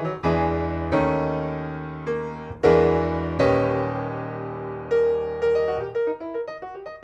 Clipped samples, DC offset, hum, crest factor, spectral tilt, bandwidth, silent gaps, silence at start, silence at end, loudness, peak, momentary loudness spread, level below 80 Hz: under 0.1%; under 0.1%; none; 16 dB; -8 dB/octave; 8 kHz; none; 0 s; 0 s; -24 LUFS; -6 dBFS; 12 LU; -42 dBFS